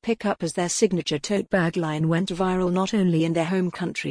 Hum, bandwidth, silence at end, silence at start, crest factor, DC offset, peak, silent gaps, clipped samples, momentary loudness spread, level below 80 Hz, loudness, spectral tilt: none; 10.5 kHz; 0 s; 0 s; 16 dB; under 0.1%; -6 dBFS; none; under 0.1%; 4 LU; -52 dBFS; -24 LUFS; -5.5 dB/octave